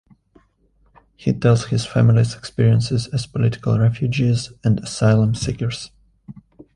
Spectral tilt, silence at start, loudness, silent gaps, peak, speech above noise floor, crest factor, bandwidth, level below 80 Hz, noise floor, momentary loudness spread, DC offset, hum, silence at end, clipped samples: -6.5 dB/octave; 1.2 s; -19 LUFS; none; -2 dBFS; 42 dB; 16 dB; 11 kHz; -44 dBFS; -59 dBFS; 9 LU; under 0.1%; none; 0.45 s; under 0.1%